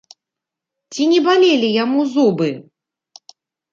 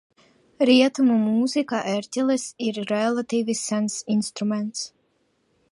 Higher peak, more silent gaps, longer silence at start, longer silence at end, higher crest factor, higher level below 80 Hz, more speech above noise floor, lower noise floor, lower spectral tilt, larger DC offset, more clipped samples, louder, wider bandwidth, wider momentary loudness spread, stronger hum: about the same, -2 dBFS vs -4 dBFS; neither; first, 0.9 s vs 0.6 s; first, 1.1 s vs 0.85 s; about the same, 16 dB vs 18 dB; about the same, -70 dBFS vs -74 dBFS; first, 70 dB vs 46 dB; first, -84 dBFS vs -68 dBFS; about the same, -5 dB/octave vs -4.5 dB/octave; neither; neither; first, -15 LUFS vs -23 LUFS; second, 7.6 kHz vs 11.5 kHz; about the same, 11 LU vs 10 LU; neither